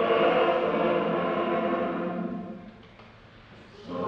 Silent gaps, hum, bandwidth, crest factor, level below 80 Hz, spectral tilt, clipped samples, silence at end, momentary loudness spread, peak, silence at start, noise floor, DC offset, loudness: none; none; 6.4 kHz; 16 dB; -62 dBFS; -7.5 dB/octave; under 0.1%; 0 s; 19 LU; -12 dBFS; 0 s; -51 dBFS; under 0.1%; -26 LUFS